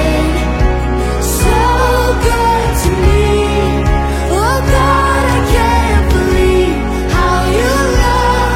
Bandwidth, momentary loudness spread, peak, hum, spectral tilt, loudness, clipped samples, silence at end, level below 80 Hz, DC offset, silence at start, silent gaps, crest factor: 16.5 kHz; 4 LU; 0 dBFS; none; -5.5 dB/octave; -12 LUFS; under 0.1%; 0 s; -16 dBFS; under 0.1%; 0 s; none; 10 dB